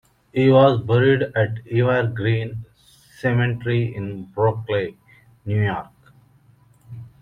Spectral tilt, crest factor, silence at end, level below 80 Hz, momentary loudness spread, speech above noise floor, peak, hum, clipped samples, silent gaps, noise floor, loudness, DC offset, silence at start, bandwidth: -9 dB/octave; 18 dB; 0.15 s; -54 dBFS; 16 LU; 35 dB; -2 dBFS; none; under 0.1%; none; -54 dBFS; -20 LUFS; under 0.1%; 0.35 s; 5.4 kHz